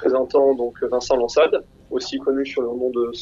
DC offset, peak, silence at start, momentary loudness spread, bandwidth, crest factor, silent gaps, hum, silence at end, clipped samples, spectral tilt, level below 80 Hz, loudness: under 0.1%; -6 dBFS; 0 s; 8 LU; 7.8 kHz; 14 dB; none; none; 0 s; under 0.1%; -4 dB/octave; -52 dBFS; -21 LUFS